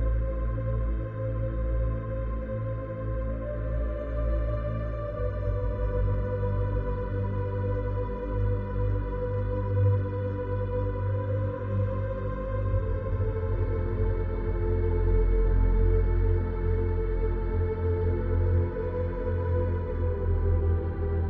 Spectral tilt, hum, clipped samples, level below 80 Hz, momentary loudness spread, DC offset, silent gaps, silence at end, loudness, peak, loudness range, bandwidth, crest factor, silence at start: -11.5 dB/octave; none; under 0.1%; -30 dBFS; 6 LU; under 0.1%; none; 0 s; -29 LUFS; -14 dBFS; 4 LU; 3.7 kHz; 14 dB; 0 s